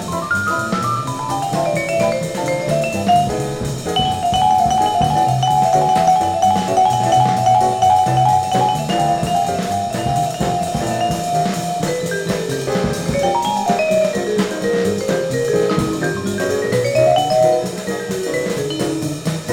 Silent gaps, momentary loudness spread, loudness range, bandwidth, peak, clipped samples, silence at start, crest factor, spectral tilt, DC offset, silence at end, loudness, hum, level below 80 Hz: none; 7 LU; 5 LU; 17.5 kHz; -2 dBFS; under 0.1%; 0 s; 14 dB; -5 dB/octave; under 0.1%; 0 s; -17 LUFS; none; -42 dBFS